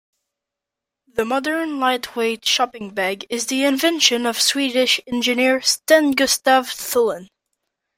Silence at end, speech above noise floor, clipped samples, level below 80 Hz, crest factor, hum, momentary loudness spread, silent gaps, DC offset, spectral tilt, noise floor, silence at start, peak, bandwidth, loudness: 0.7 s; 66 dB; under 0.1%; -62 dBFS; 20 dB; none; 8 LU; none; under 0.1%; -1 dB/octave; -85 dBFS; 1.15 s; 0 dBFS; 16.5 kHz; -18 LUFS